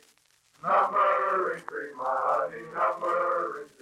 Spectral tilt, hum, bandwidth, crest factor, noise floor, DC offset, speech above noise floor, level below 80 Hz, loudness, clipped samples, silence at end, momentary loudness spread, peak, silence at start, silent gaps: -5 dB/octave; none; 12.5 kHz; 14 dB; -64 dBFS; under 0.1%; 36 dB; -78 dBFS; -27 LUFS; under 0.1%; 0.15 s; 11 LU; -14 dBFS; 0.65 s; none